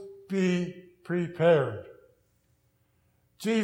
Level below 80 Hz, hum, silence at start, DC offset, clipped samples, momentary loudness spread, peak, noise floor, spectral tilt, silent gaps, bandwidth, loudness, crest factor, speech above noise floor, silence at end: -74 dBFS; none; 0 s; under 0.1%; under 0.1%; 15 LU; -12 dBFS; -69 dBFS; -7 dB/octave; none; 15.5 kHz; -28 LUFS; 18 dB; 43 dB; 0 s